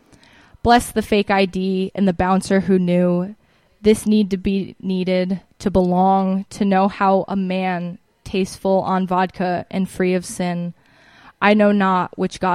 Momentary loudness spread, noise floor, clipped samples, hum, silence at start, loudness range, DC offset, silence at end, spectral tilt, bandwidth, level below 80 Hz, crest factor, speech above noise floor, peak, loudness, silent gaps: 8 LU; -50 dBFS; under 0.1%; none; 0.65 s; 3 LU; under 0.1%; 0 s; -6.5 dB/octave; 13.5 kHz; -44 dBFS; 18 dB; 32 dB; -2 dBFS; -19 LUFS; none